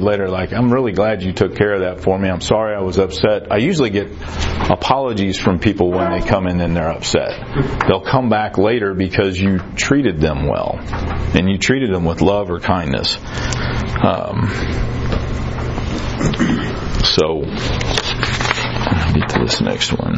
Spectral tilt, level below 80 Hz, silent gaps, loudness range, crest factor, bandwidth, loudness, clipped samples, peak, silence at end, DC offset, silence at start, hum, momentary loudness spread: -5.5 dB/octave; -28 dBFS; none; 3 LU; 16 dB; 9.6 kHz; -17 LUFS; under 0.1%; 0 dBFS; 0 s; under 0.1%; 0 s; none; 6 LU